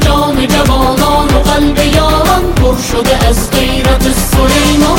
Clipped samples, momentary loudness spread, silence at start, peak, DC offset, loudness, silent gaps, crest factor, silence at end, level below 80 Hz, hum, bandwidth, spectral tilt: under 0.1%; 3 LU; 0 s; 0 dBFS; under 0.1%; -10 LUFS; none; 8 dB; 0 s; -14 dBFS; none; 17.5 kHz; -4.5 dB/octave